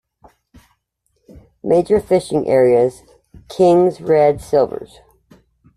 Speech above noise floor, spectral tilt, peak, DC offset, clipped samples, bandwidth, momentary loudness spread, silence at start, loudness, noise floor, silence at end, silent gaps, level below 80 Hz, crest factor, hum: 54 dB; -7 dB/octave; -2 dBFS; under 0.1%; under 0.1%; 12.5 kHz; 9 LU; 1.65 s; -15 LUFS; -68 dBFS; 0.9 s; none; -50 dBFS; 14 dB; none